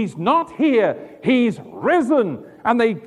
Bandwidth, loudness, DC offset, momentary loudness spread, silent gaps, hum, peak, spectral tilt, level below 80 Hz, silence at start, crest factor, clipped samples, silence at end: 11 kHz; -19 LUFS; under 0.1%; 8 LU; none; none; -4 dBFS; -6.5 dB/octave; -62 dBFS; 0 s; 16 dB; under 0.1%; 0 s